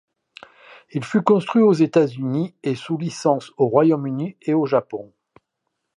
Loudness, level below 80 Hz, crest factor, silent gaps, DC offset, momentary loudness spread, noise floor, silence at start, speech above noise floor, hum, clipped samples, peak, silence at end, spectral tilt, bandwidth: -20 LUFS; -70 dBFS; 20 dB; none; under 0.1%; 11 LU; -77 dBFS; 0.95 s; 58 dB; none; under 0.1%; -2 dBFS; 0.9 s; -7.5 dB/octave; 11 kHz